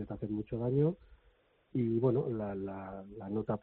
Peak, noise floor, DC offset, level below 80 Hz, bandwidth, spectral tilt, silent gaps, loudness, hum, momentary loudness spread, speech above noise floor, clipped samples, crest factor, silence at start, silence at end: -18 dBFS; -69 dBFS; under 0.1%; -60 dBFS; 4.2 kHz; -10.5 dB/octave; none; -35 LUFS; none; 14 LU; 35 dB; under 0.1%; 18 dB; 0 s; 0.05 s